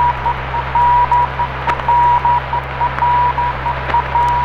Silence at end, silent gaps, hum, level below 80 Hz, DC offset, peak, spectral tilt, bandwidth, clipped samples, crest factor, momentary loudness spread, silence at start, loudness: 0 s; none; none; -30 dBFS; under 0.1%; 0 dBFS; -6 dB/octave; 7 kHz; under 0.1%; 14 dB; 7 LU; 0 s; -15 LUFS